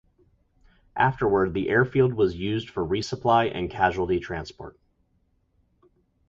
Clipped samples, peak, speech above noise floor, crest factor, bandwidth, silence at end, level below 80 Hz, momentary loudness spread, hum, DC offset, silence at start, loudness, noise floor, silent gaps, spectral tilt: under 0.1%; -6 dBFS; 44 dB; 20 dB; 7.6 kHz; 1.6 s; -48 dBFS; 13 LU; none; under 0.1%; 0.95 s; -24 LUFS; -68 dBFS; none; -6.5 dB/octave